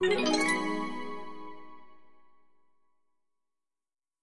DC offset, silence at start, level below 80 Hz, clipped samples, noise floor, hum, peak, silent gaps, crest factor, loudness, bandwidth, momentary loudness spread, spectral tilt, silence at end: under 0.1%; 0 s; -66 dBFS; under 0.1%; under -90 dBFS; none; -14 dBFS; none; 20 dB; -30 LUFS; 11.5 kHz; 22 LU; -3 dB/octave; 0 s